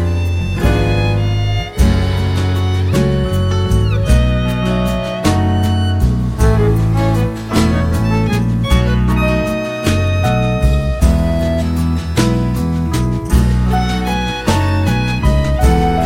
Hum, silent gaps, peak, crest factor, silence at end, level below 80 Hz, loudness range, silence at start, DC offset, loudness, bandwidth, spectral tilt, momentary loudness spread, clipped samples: none; none; 0 dBFS; 12 dB; 0 s; -18 dBFS; 1 LU; 0 s; under 0.1%; -15 LUFS; 16.5 kHz; -6.5 dB/octave; 3 LU; under 0.1%